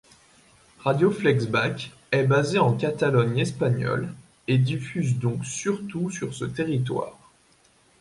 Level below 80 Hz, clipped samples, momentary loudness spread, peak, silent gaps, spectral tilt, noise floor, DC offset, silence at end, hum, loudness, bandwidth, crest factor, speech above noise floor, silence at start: -60 dBFS; under 0.1%; 9 LU; -8 dBFS; none; -6 dB/octave; -60 dBFS; under 0.1%; 0.9 s; none; -25 LUFS; 11.5 kHz; 18 dB; 36 dB; 0.8 s